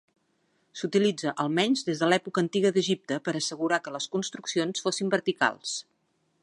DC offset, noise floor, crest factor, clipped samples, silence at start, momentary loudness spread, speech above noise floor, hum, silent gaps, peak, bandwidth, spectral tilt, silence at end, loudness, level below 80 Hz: under 0.1%; -72 dBFS; 20 dB; under 0.1%; 0.75 s; 7 LU; 45 dB; none; none; -8 dBFS; 11.5 kHz; -4 dB/octave; 0.6 s; -27 LUFS; -78 dBFS